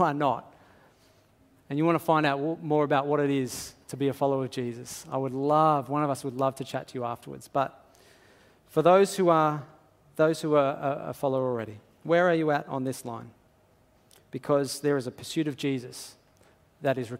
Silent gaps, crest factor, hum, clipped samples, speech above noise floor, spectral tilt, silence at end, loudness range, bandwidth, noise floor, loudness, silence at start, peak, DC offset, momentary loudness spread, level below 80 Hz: none; 22 dB; none; under 0.1%; 36 dB; -6 dB/octave; 0 s; 6 LU; 16 kHz; -62 dBFS; -27 LUFS; 0 s; -6 dBFS; under 0.1%; 15 LU; -70 dBFS